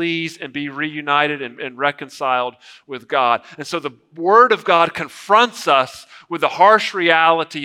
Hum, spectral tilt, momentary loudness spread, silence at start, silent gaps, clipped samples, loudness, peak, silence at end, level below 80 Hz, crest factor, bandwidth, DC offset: none; -4 dB/octave; 14 LU; 0 s; none; under 0.1%; -17 LUFS; 0 dBFS; 0 s; -68 dBFS; 18 dB; 15.5 kHz; under 0.1%